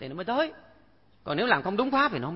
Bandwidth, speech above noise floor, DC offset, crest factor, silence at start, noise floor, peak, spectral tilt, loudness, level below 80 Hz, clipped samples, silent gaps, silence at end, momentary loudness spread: 5.8 kHz; 34 dB; under 0.1%; 20 dB; 0 s; -61 dBFS; -8 dBFS; -9 dB/octave; -27 LUFS; -62 dBFS; under 0.1%; none; 0 s; 8 LU